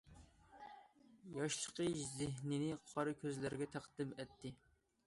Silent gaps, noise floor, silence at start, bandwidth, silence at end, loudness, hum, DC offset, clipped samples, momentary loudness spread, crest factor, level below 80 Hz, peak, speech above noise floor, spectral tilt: none; -66 dBFS; 0.05 s; 11.5 kHz; 0.5 s; -44 LUFS; none; under 0.1%; under 0.1%; 17 LU; 18 dB; -72 dBFS; -28 dBFS; 22 dB; -4.5 dB/octave